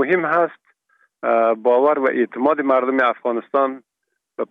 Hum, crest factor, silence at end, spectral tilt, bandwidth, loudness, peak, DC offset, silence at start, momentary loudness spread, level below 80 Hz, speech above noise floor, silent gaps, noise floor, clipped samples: none; 14 dB; 0.05 s; -8 dB/octave; 5 kHz; -18 LUFS; -4 dBFS; under 0.1%; 0 s; 9 LU; -76 dBFS; 59 dB; none; -77 dBFS; under 0.1%